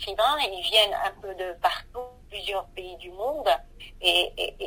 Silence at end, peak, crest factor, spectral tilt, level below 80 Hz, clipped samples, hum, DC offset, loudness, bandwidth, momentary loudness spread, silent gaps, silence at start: 0 s; -6 dBFS; 20 dB; -1.5 dB/octave; -50 dBFS; under 0.1%; none; under 0.1%; -25 LUFS; 16 kHz; 19 LU; none; 0 s